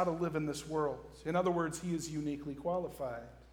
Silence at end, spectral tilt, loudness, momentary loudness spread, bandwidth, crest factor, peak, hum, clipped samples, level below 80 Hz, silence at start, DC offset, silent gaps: 0 s; -6 dB/octave; -37 LUFS; 9 LU; 19.5 kHz; 16 dB; -20 dBFS; none; under 0.1%; -60 dBFS; 0 s; under 0.1%; none